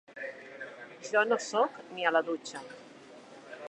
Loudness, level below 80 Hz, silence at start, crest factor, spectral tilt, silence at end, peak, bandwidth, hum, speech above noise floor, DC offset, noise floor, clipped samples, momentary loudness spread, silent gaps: -31 LUFS; -86 dBFS; 0.1 s; 22 dB; -2.5 dB/octave; 0 s; -12 dBFS; 10.5 kHz; none; 22 dB; under 0.1%; -52 dBFS; under 0.1%; 23 LU; none